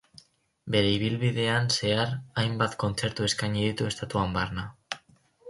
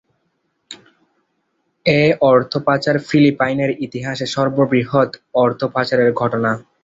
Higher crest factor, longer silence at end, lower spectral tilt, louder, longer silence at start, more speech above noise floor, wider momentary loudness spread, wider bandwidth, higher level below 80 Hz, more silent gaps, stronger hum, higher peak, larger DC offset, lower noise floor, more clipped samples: about the same, 20 dB vs 16 dB; second, 0 s vs 0.2 s; second, -4.5 dB/octave vs -6.5 dB/octave; second, -27 LUFS vs -17 LUFS; about the same, 0.65 s vs 0.7 s; second, 33 dB vs 52 dB; first, 13 LU vs 10 LU; first, 11.5 kHz vs 8 kHz; first, -50 dBFS vs -56 dBFS; neither; neither; second, -8 dBFS vs 0 dBFS; neither; second, -60 dBFS vs -68 dBFS; neither